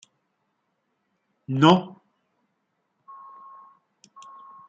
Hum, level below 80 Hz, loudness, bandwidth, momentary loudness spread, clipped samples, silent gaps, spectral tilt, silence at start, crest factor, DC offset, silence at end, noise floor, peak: none; -72 dBFS; -20 LUFS; 7.8 kHz; 28 LU; under 0.1%; none; -6.5 dB/octave; 1.5 s; 26 dB; under 0.1%; 2.8 s; -75 dBFS; -2 dBFS